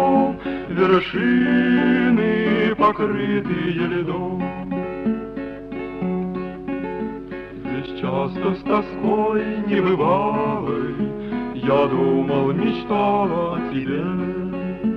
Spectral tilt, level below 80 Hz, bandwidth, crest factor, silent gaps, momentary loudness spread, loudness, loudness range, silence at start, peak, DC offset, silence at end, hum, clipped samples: -9 dB/octave; -48 dBFS; 5.8 kHz; 16 dB; none; 11 LU; -21 LUFS; 8 LU; 0 s; -6 dBFS; under 0.1%; 0 s; none; under 0.1%